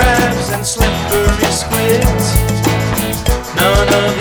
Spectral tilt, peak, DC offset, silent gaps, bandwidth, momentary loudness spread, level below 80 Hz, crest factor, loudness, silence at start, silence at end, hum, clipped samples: -4.5 dB/octave; 0 dBFS; under 0.1%; none; over 20 kHz; 5 LU; -20 dBFS; 12 dB; -13 LUFS; 0 s; 0 s; none; under 0.1%